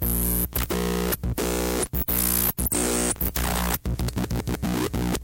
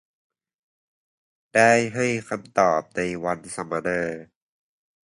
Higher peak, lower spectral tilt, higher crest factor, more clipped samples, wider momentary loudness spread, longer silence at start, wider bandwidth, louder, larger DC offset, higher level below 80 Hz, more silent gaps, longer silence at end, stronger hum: second, -10 dBFS vs -4 dBFS; about the same, -4 dB/octave vs -4.5 dB/octave; second, 14 dB vs 22 dB; neither; second, 6 LU vs 12 LU; second, 0 s vs 1.55 s; first, 17.5 kHz vs 11.5 kHz; about the same, -24 LUFS vs -23 LUFS; neither; first, -32 dBFS vs -60 dBFS; neither; second, 0 s vs 0.8 s; first, 60 Hz at -35 dBFS vs none